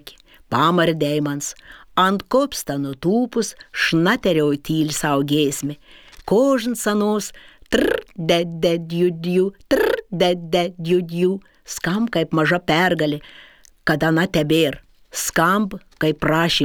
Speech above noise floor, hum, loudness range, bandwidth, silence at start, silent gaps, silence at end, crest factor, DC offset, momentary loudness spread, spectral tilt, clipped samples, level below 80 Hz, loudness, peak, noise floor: 25 dB; none; 1 LU; over 20 kHz; 0.05 s; none; 0 s; 18 dB; under 0.1%; 9 LU; -5 dB/octave; under 0.1%; -48 dBFS; -20 LUFS; -2 dBFS; -45 dBFS